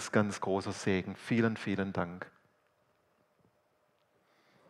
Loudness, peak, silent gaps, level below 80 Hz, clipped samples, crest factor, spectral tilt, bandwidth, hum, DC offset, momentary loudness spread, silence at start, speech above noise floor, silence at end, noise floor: -33 LUFS; -12 dBFS; none; -72 dBFS; under 0.1%; 22 dB; -6 dB/octave; 12 kHz; none; under 0.1%; 9 LU; 0 s; 41 dB; 2.4 s; -74 dBFS